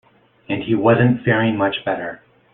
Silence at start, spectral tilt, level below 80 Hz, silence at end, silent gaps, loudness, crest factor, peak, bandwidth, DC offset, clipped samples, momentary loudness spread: 0.5 s; -11.5 dB/octave; -54 dBFS; 0.35 s; none; -18 LUFS; 16 dB; -2 dBFS; 4 kHz; under 0.1%; under 0.1%; 12 LU